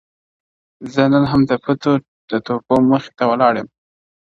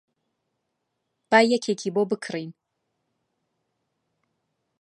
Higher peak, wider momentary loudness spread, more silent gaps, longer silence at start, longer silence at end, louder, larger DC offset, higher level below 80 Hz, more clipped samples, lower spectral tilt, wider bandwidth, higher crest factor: about the same, 0 dBFS vs -2 dBFS; second, 10 LU vs 15 LU; first, 2.08-2.28 s vs none; second, 0.8 s vs 1.3 s; second, 0.65 s vs 2.3 s; first, -17 LUFS vs -23 LUFS; neither; first, -50 dBFS vs -82 dBFS; neither; first, -8 dB/octave vs -4.5 dB/octave; second, 7.2 kHz vs 11 kHz; second, 18 dB vs 26 dB